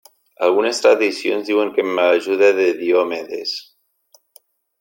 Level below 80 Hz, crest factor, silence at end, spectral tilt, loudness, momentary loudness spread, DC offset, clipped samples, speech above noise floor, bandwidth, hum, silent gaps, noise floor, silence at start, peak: -72 dBFS; 16 dB; 1.2 s; -3 dB/octave; -17 LUFS; 10 LU; under 0.1%; under 0.1%; 40 dB; 17 kHz; none; none; -57 dBFS; 0.4 s; -2 dBFS